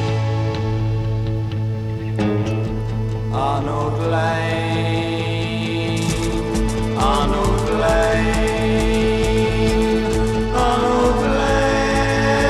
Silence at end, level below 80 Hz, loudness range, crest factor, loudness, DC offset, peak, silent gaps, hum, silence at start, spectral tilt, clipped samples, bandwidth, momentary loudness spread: 0 s; -28 dBFS; 4 LU; 14 dB; -19 LUFS; under 0.1%; -4 dBFS; none; none; 0 s; -6 dB/octave; under 0.1%; 13 kHz; 6 LU